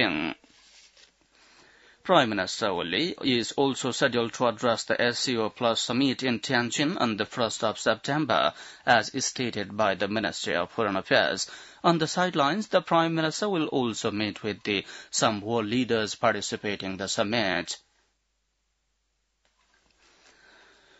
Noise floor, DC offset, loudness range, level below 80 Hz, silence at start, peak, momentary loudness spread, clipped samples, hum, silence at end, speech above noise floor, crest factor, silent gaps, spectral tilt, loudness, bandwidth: -75 dBFS; under 0.1%; 4 LU; -68 dBFS; 0 s; -6 dBFS; 7 LU; under 0.1%; none; 3.2 s; 49 dB; 22 dB; none; -3.5 dB/octave; -26 LUFS; 8.2 kHz